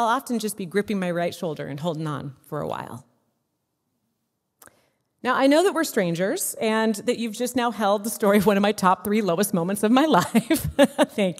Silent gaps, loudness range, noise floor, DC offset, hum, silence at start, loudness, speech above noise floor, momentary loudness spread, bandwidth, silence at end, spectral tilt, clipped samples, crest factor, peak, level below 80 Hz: none; 13 LU; -76 dBFS; under 0.1%; none; 0 s; -23 LUFS; 54 dB; 12 LU; 16 kHz; 0 s; -5 dB/octave; under 0.1%; 20 dB; -4 dBFS; -56 dBFS